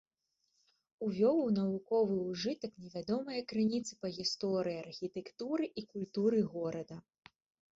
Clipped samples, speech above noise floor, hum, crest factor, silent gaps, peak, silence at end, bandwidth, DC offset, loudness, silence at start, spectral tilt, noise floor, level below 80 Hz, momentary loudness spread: under 0.1%; 47 dB; none; 16 dB; none; -20 dBFS; 0.75 s; 7.8 kHz; under 0.1%; -36 LUFS; 1 s; -6 dB/octave; -82 dBFS; -74 dBFS; 11 LU